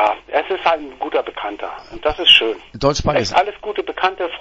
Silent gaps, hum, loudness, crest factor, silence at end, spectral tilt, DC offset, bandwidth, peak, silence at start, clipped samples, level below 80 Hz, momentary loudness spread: none; none; -17 LUFS; 18 dB; 0 s; -3.5 dB/octave; under 0.1%; 10.5 kHz; 0 dBFS; 0 s; under 0.1%; -40 dBFS; 16 LU